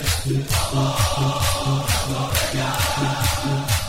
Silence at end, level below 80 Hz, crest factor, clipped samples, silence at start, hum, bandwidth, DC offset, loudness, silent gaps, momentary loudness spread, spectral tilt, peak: 0 s; -32 dBFS; 18 dB; under 0.1%; 0 s; none; 16.5 kHz; under 0.1%; -21 LUFS; none; 2 LU; -4 dB/octave; -2 dBFS